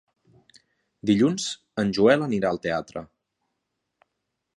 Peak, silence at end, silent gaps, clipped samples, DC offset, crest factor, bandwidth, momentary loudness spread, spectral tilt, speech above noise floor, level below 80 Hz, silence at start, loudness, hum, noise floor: -4 dBFS; 1.5 s; none; under 0.1%; under 0.1%; 22 dB; 11.5 kHz; 12 LU; -5.5 dB/octave; 58 dB; -60 dBFS; 1.05 s; -23 LUFS; none; -80 dBFS